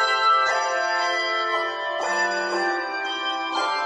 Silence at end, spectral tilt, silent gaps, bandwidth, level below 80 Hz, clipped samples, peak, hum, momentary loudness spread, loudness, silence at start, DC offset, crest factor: 0 s; -1 dB/octave; none; 11 kHz; -70 dBFS; under 0.1%; -10 dBFS; none; 7 LU; -22 LUFS; 0 s; under 0.1%; 14 dB